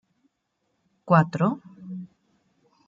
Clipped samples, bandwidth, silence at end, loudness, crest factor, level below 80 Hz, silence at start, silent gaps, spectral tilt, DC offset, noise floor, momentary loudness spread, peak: under 0.1%; 7.4 kHz; 0.8 s; -22 LUFS; 22 dB; -72 dBFS; 1.05 s; none; -9 dB/octave; under 0.1%; -76 dBFS; 19 LU; -6 dBFS